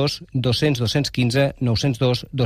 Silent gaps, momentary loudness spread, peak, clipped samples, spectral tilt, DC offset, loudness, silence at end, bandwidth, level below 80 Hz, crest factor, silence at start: none; 2 LU; -6 dBFS; under 0.1%; -6 dB/octave; under 0.1%; -20 LUFS; 0 s; 14.5 kHz; -44 dBFS; 14 dB; 0 s